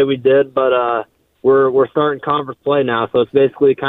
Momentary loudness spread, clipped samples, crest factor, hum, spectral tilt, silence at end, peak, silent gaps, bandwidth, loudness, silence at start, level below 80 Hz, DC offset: 7 LU; under 0.1%; 14 dB; none; -9 dB/octave; 0 s; 0 dBFS; none; 4 kHz; -15 LUFS; 0 s; -58 dBFS; under 0.1%